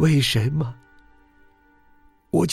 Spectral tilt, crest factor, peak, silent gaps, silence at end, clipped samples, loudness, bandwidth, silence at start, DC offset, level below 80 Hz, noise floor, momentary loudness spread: -5.5 dB/octave; 16 dB; -8 dBFS; none; 0 s; under 0.1%; -22 LUFS; 14.5 kHz; 0 s; under 0.1%; -50 dBFS; -56 dBFS; 14 LU